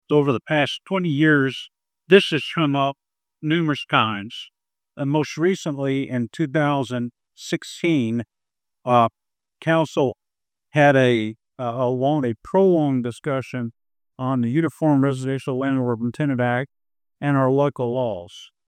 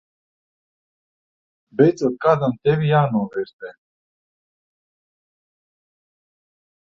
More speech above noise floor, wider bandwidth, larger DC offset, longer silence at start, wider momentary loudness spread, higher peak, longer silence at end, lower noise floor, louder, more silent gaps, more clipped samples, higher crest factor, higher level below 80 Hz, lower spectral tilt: second, 67 dB vs over 71 dB; first, 13.5 kHz vs 7.6 kHz; neither; second, 0.1 s vs 1.8 s; second, 13 LU vs 16 LU; about the same, 0 dBFS vs -2 dBFS; second, 0.25 s vs 3.15 s; about the same, -87 dBFS vs under -90 dBFS; about the same, -21 LUFS vs -19 LUFS; second, none vs 3.53-3.59 s; neither; about the same, 22 dB vs 22 dB; about the same, -66 dBFS vs -62 dBFS; second, -6.5 dB/octave vs -8 dB/octave